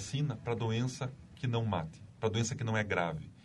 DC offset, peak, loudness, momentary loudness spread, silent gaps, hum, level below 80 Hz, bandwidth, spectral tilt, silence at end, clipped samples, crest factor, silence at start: under 0.1%; -16 dBFS; -35 LUFS; 7 LU; none; none; -60 dBFS; 11.5 kHz; -5.5 dB/octave; 0.05 s; under 0.1%; 18 dB; 0 s